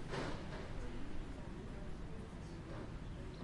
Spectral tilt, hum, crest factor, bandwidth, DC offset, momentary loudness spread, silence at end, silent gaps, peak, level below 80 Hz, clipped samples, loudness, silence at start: -6 dB/octave; none; 14 dB; 11.5 kHz; under 0.1%; 6 LU; 0 s; none; -30 dBFS; -50 dBFS; under 0.1%; -49 LUFS; 0 s